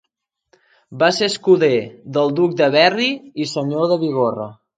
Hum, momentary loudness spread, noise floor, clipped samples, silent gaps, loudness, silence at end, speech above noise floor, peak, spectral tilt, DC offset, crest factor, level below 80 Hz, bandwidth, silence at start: none; 9 LU; -77 dBFS; under 0.1%; none; -17 LUFS; 0.25 s; 60 dB; 0 dBFS; -5 dB/octave; under 0.1%; 18 dB; -66 dBFS; 9.4 kHz; 0.9 s